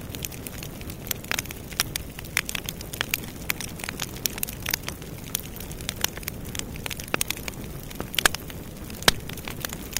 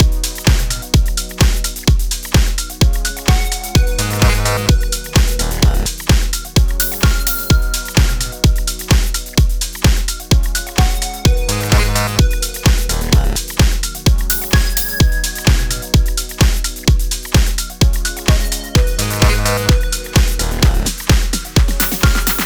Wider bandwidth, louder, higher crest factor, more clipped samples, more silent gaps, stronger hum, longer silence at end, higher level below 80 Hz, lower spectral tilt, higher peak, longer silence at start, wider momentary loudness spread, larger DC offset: second, 16.5 kHz vs over 20 kHz; second, -29 LUFS vs -15 LUFS; first, 28 dB vs 12 dB; neither; neither; neither; about the same, 0 s vs 0 s; second, -42 dBFS vs -16 dBFS; second, -2 dB/octave vs -4 dB/octave; about the same, -2 dBFS vs -2 dBFS; about the same, 0 s vs 0 s; first, 13 LU vs 3 LU; second, under 0.1% vs 0.2%